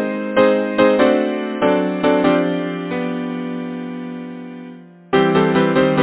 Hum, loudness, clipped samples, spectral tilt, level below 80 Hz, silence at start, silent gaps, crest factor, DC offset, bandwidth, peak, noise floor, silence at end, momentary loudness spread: none; -17 LUFS; under 0.1%; -10.5 dB/octave; -52 dBFS; 0 s; none; 16 dB; under 0.1%; 4 kHz; 0 dBFS; -38 dBFS; 0 s; 15 LU